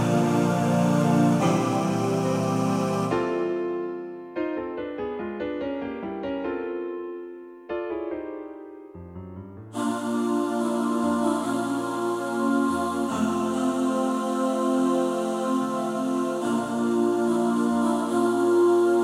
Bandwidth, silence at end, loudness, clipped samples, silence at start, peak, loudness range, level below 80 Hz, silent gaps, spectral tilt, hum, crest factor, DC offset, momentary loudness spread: 15.5 kHz; 0 s; -25 LUFS; under 0.1%; 0 s; -10 dBFS; 9 LU; -60 dBFS; none; -6.5 dB/octave; none; 14 dB; under 0.1%; 13 LU